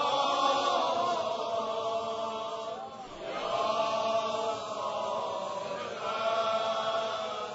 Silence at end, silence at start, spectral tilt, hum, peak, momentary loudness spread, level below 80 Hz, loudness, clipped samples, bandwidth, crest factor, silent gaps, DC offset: 0 s; 0 s; -0.5 dB/octave; none; -14 dBFS; 9 LU; -70 dBFS; -31 LUFS; under 0.1%; 7.6 kHz; 16 dB; none; under 0.1%